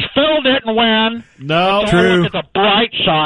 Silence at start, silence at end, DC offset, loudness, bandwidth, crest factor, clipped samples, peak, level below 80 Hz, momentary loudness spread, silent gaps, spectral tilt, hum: 0 s; 0 s; under 0.1%; -13 LUFS; 11 kHz; 12 dB; under 0.1%; -2 dBFS; -40 dBFS; 6 LU; none; -5.5 dB/octave; none